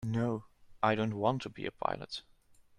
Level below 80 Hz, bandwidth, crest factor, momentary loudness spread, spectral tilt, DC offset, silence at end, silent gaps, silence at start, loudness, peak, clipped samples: -64 dBFS; 11 kHz; 22 dB; 11 LU; -7 dB/octave; under 0.1%; 0.6 s; none; 0 s; -35 LUFS; -14 dBFS; under 0.1%